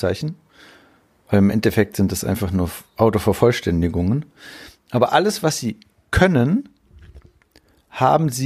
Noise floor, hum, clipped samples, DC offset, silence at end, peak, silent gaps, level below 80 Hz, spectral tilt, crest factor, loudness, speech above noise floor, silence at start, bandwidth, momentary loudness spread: -56 dBFS; none; under 0.1%; under 0.1%; 0 s; -2 dBFS; none; -40 dBFS; -6 dB/octave; 18 dB; -19 LUFS; 37 dB; 0 s; 15.5 kHz; 13 LU